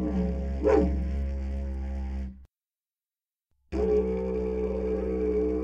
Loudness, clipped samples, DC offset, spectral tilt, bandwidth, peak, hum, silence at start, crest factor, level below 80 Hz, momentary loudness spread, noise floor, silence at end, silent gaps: -29 LUFS; under 0.1%; under 0.1%; -9.5 dB/octave; 7.2 kHz; -10 dBFS; none; 0 s; 18 dB; -34 dBFS; 10 LU; under -90 dBFS; 0 s; none